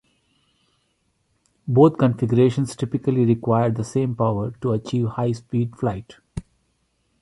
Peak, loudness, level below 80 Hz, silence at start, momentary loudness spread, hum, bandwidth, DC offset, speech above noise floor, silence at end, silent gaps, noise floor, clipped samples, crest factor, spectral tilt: -2 dBFS; -21 LUFS; -52 dBFS; 1.65 s; 19 LU; none; 11.5 kHz; under 0.1%; 49 dB; 0.8 s; none; -69 dBFS; under 0.1%; 20 dB; -8.5 dB/octave